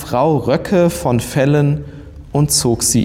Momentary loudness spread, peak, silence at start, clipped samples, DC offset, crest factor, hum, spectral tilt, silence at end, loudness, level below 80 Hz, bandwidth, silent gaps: 7 LU; -4 dBFS; 0 s; under 0.1%; under 0.1%; 12 dB; none; -5 dB/octave; 0 s; -15 LUFS; -36 dBFS; 16.5 kHz; none